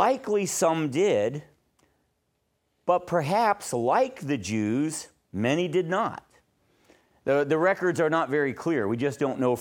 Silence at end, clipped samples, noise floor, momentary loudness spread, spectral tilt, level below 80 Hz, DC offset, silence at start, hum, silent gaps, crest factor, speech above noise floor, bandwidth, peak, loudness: 0 s; under 0.1%; -74 dBFS; 7 LU; -5 dB/octave; -68 dBFS; under 0.1%; 0 s; none; none; 18 dB; 50 dB; 18 kHz; -8 dBFS; -26 LUFS